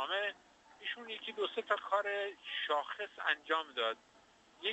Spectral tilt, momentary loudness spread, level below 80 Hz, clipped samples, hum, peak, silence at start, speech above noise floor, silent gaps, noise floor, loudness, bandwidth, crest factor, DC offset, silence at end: -1.5 dB/octave; 9 LU; -84 dBFS; under 0.1%; none; -18 dBFS; 0 s; 27 dB; none; -65 dBFS; -37 LUFS; 8.2 kHz; 22 dB; under 0.1%; 0 s